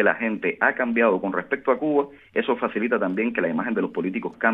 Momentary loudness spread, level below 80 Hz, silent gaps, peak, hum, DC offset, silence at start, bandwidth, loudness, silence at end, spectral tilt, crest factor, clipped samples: 6 LU; -68 dBFS; none; -4 dBFS; none; under 0.1%; 0 s; 3.9 kHz; -23 LUFS; 0 s; -9 dB/octave; 20 dB; under 0.1%